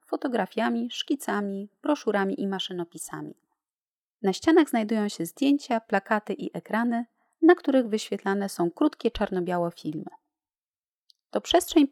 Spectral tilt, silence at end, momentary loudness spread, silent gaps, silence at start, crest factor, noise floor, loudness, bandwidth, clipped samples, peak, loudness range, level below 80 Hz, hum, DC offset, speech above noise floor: -5 dB/octave; 0.05 s; 13 LU; 3.78-4.15 s, 10.58-10.83 s, 10.89-11.07 s; 0.1 s; 20 dB; under -90 dBFS; -26 LUFS; 15 kHz; under 0.1%; -6 dBFS; 5 LU; -58 dBFS; none; under 0.1%; over 64 dB